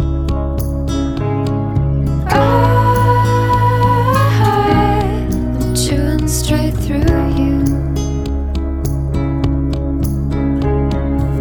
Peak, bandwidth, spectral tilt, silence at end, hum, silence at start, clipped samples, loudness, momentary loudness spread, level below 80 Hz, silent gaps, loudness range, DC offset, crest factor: 0 dBFS; 20 kHz; -6.5 dB/octave; 0 s; none; 0 s; under 0.1%; -15 LUFS; 7 LU; -20 dBFS; none; 5 LU; under 0.1%; 14 dB